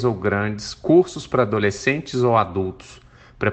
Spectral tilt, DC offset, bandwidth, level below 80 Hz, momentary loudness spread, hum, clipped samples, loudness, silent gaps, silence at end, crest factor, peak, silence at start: -6 dB/octave; under 0.1%; 8.6 kHz; -50 dBFS; 10 LU; none; under 0.1%; -20 LUFS; none; 0 s; 18 dB; -2 dBFS; 0 s